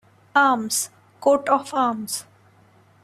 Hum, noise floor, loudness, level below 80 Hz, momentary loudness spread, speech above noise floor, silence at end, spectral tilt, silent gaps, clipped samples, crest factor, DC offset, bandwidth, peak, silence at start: none; -55 dBFS; -22 LUFS; -68 dBFS; 11 LU; 34 dB; 0.8 s; -2.5 dB/octave; none; under 0.1%; 20 dB; under 0.1%; 15 kHz; -4 dBFS; 0.35 s